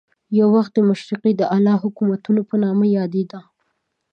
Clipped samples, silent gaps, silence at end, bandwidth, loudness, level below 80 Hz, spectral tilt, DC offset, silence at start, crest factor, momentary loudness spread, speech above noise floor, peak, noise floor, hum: under 0.1%; none; 0.75 s; 6.4 kHz; -18 LUFS; -72 dBFS; -9 dB/octave; under 0.1%; 0.3 s; 14 dB; 6 LU; 55 dB; -4 dBFS; -72 dBFS; none